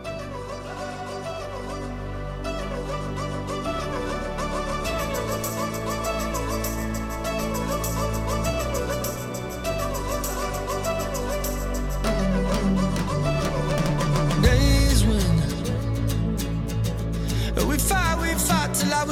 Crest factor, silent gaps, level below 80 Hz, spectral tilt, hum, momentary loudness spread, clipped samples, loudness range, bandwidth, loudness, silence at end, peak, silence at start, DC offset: 18 dB; none; -30 dBFS; -5 dB/octave; none; 11 LU; under 0.1%; 8 LU; 17 kHz; -25 LUFS; 0 s; -6 dBFS; 0 s; under 0.1%